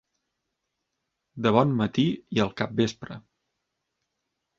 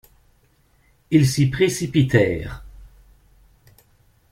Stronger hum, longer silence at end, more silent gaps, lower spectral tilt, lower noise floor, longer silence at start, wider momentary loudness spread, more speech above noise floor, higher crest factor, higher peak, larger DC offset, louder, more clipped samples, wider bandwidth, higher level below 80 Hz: neither; about the same, 1.4 s vs 1.45 s; neither; about the same, -6.5 dB/octave vs -6 dB/octave; first, -81 dBFS vs -59 dBFS; first, 1.35 s vs 1.1 s; first, 19 LU vs 14 LU; first, 57 dB vs 41 dB; about the same, 24 dB vs 20 dB; about the same, -4 dBFS vs -4 dBFS; neither; second, -25 LUFS vs -19 LUFS; neither; second, 7.6 kHz vs 16 kHz; second, -60 dBFS vs -44 dBFS